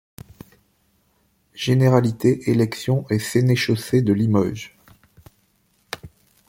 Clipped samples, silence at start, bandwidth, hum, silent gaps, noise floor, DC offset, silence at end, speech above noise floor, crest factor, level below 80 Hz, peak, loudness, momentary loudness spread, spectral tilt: under 0.1%; 1.55 s; 16.5 kHz; none; none; -64 dBFS; under 0.1%; 0.4 s; 45 dB; 18 dB; -54 dBFS; -4 dBFS; -20 LUFS; 18 LU; -6.5 dB/octave